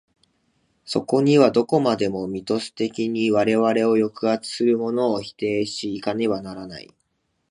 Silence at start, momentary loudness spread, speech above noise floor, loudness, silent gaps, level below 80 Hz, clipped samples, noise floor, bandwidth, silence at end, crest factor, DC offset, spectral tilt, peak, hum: 0.85 s; 10 LU; 50 dB; -21 LUFS; none; -62 dBFS; under 0.1%; -71 dBFS; 11 kHz; 0.7 s; 20 dB; under 0.1%; -6 dB/octave; -2 dBFS; none